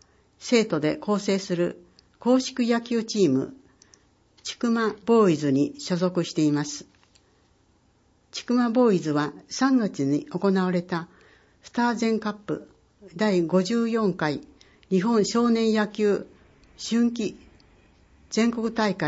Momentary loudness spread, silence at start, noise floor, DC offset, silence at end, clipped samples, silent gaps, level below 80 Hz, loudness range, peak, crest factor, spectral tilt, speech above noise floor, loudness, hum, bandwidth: 12 LU; 0.4 s; -63 dBFS; under 0.1%; 0 s; under 0.1%; none; -64 dBFS; 3 LU; -8 dBFS; 18 dB; -5.5 dB/octave; 39 dB; -24 LUFS; none; 8 kHz